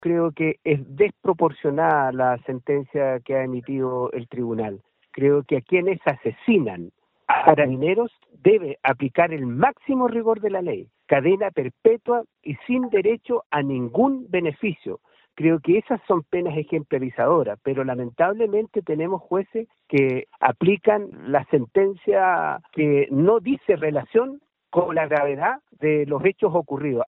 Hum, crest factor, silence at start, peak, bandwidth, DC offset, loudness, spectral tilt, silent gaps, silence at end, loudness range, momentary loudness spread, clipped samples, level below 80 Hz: none; 22 dB; 0 s; 0 dBFS; 4.1 kHz; under 0.1%; -22 LUFS; -10.5 dB/octave; 13.46-13.50 s; 0 s; 3 LU; 8 LU; under 0.1%; -64 dBFS